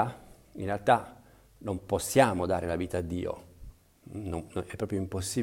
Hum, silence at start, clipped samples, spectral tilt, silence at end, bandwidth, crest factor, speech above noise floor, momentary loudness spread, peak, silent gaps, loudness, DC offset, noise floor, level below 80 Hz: none; 0 s; under 0.1%; -5 dB/octave; 0 s; 16 kHz; 24 dB; 21 dB; 18 LU; -8 dBFS; none; -30 LUFS; under 0.1%; -50 dBFS; -52 dBFS